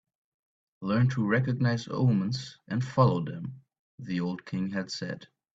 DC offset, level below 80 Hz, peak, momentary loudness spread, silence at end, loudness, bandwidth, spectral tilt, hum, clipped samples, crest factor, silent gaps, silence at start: under 0.1%; -62 dBFS; -8 dBFS; 14 LU; 0.3 s; -29 LUFS; 7.8 kHz; -7 dB/octave; none; under 0.1%; 20 dB; 3.79-3.98 s; 0.8 s